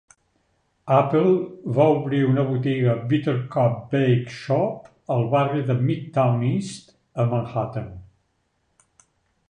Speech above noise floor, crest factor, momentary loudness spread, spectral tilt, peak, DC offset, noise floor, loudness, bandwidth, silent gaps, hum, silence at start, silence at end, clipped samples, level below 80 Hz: 49 dB; 18 dB; 10 LU; -8 dB/octave; -4 dBFS; under 0.1%; -70 dBFS; -22 LUFS; 9.8 kHz; none; none; 0.85 s; 1.45 s; under 0.1%; -58 dBFS